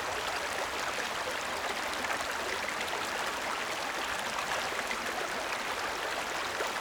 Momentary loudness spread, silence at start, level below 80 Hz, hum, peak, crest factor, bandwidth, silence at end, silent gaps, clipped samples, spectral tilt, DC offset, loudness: 1 LU; 0 s; -60 dBFS; none; -18 dBFS; 18 dB; over 20 kHz; 0 s; none; under 0.1%; -1 dB/octave; under 0.1%; -33 LUFS